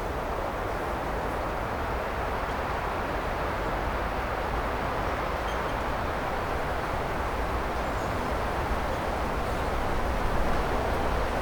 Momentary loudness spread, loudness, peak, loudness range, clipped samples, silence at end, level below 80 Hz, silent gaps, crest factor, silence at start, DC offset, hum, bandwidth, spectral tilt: 2 LU; -30 LUFS; -14 dBFS; 1 LU; under 0.1%; 0 s; -34 dBFS; none; 16 dB; 0 s; under 0.1%; none; 19.5 kHz; -5.5 dB/octave